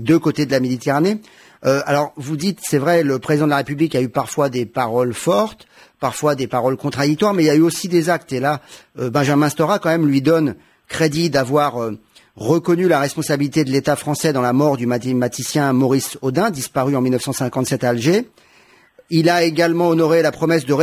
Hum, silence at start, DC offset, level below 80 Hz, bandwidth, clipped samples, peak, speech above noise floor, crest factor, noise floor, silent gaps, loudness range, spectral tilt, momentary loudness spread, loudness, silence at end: none; 0 s; under 0.1%; -56 dBFS; 16 kHz; under 0.1%; -2 dBFS; 34 dB; 14 dB; -51 dBFS; none; 2 LU; -5.5 dB/octave; 6 LU; -18 LUFS; 0 s